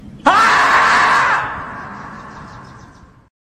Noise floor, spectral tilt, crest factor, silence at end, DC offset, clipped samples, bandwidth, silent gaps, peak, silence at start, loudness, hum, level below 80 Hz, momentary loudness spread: -42 dBFS; -2.5 dB/octave; 16 dB; 0.85 s; under 0.1%; under 0.1%; 13 kHz; none; 0 dBFS; 0.05 s; -12 LUFS; none; -46 dBFS; 23 LU